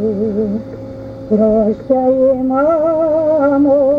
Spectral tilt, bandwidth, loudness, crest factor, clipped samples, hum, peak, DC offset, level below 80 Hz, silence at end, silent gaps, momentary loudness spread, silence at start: -10.5 dB/octave; 5.2 kHz; -14 LUFS; 12 dB; under 0.1%; none; -2 dBFS; under 0.1%; -42 dBFS; 0 s; none; 14 LU; 0 s